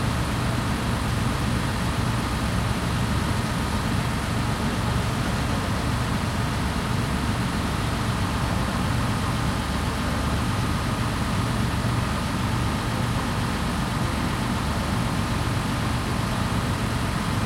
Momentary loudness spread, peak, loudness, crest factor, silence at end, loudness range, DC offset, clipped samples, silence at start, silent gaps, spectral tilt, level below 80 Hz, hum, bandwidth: 1 LU; -10 dBFS; -25 LUFS; 14 dB; 0 s; 0 LU; under 0.1%; under 0.1%; 0 s; none; -5.5 dB/octave; -32 dBFS; none; 16 kHz